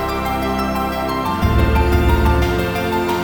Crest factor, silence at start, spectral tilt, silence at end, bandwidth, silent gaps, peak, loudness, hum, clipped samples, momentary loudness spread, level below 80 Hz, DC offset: 14 dB; 0 s; -6.5 dB/octave; 0 s; over 20 kHz; none; -4 dBFS; -18 LUFS; none; under 0.1%; 5 LU; -22 dBFS; 0.3%